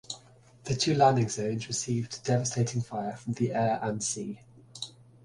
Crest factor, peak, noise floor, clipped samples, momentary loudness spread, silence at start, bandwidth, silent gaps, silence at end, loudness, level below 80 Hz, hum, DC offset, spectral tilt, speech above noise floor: 20 dB; -10 dBFS; -56 dBFS; under 0.1%; 18 LU; 0.1 s; 11.5 kHz; none; 0.35 s; -29 LUFS; -62 dBFS; none; under 0.1%; -5 dB/octave; 27 dB